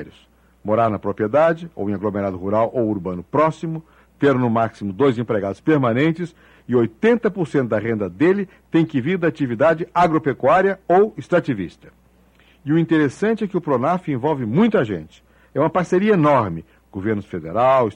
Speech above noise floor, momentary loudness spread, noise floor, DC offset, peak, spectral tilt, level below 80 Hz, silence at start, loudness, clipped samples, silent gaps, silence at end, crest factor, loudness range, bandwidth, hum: 35 dB; 9 LU; -54 dBFS; under 0.1%; -6 dBFS; -8 dB/octave; -54 dBFS; 0 s; -19 LUFS; under 0.1%; none; 0.05 s; 14 dB; 3 LU; 10 kHz; none